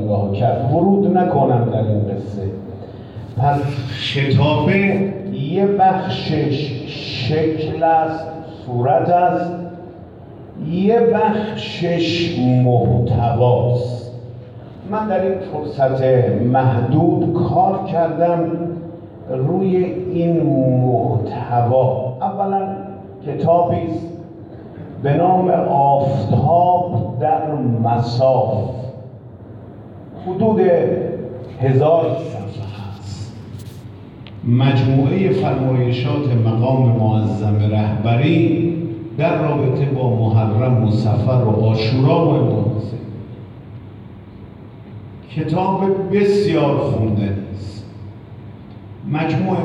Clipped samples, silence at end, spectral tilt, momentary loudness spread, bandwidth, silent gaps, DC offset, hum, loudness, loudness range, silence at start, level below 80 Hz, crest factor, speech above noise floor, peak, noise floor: under 0.1%; 0 s; -9 dB/octave; 21 LU; 7.6 kHz; none; under 0.1%; none; -17 LUFS; 4 LU; 0 s; -48 dBFS; 14 dB; 21 dB; -4 dBFS; -36 dBFS